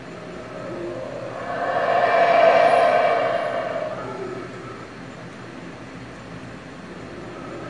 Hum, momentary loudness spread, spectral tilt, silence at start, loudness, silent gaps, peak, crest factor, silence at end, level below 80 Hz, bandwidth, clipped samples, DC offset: none; 22 LU; -5.5 dB/octave; 0 s; -20 LUFS; none; -4 dBFS; 20 dB; 0 s; -56 dBFS; 10.5 kHz; under 0.1%; 0.2%